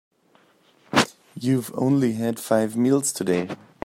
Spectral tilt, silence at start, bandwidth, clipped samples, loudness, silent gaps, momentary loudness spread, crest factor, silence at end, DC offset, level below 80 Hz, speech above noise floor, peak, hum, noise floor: -5 dB/octave; 0.9 s; 16 kHz; under 0.1%; -23 LUFS; none; 6 LU; 20 dB; 0.3 s; under 0.1%; -62 dBFS; 38 dB; -4 dBFS; none; -60 dBFS